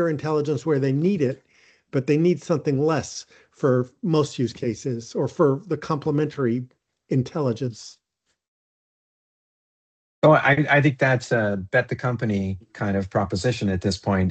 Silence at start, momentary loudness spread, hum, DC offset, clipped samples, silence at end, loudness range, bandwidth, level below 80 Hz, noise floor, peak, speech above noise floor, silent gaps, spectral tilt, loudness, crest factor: 0 s; 11 LU; none; under 0.1%; under 0.1%; 0 s; 7 LU; 8.8 kHz; -60 dBFS; under -90 dBFS; -4 dBFS; over 68 dB; 8.48-10.22 s; -6.5 dB/octave; -23 LUFS; 20 dB